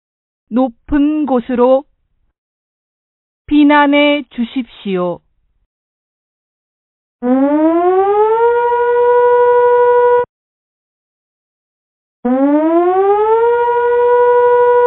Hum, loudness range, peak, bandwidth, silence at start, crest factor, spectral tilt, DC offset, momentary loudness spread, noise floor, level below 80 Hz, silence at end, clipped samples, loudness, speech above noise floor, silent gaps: none; 6 LU; 0 dBFS; 4.1 kHz; 0.5 s; 14 dB; -10 dB/octave; under 0.1%; 11 LU; -61 dBFS; -44 dBFS; 0 s; under 0.1%; -12 LUFS; 48 dB; 2.38-3.45 s, 5.66-7.19 s, 10.29-12.23 s